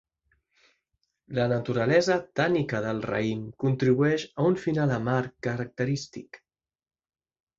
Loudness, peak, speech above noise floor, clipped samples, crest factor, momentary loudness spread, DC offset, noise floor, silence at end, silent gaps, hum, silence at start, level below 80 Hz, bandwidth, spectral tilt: -27 LUFS; -10 dBFS; 52 dB; under 0.1%; 18 dB; 9 LU; under 0.1%; -78 dBFS; 1.2 s; none; none; 1.3 s; -60 dBFS; 7.8 kHz; -6.5 dB/octave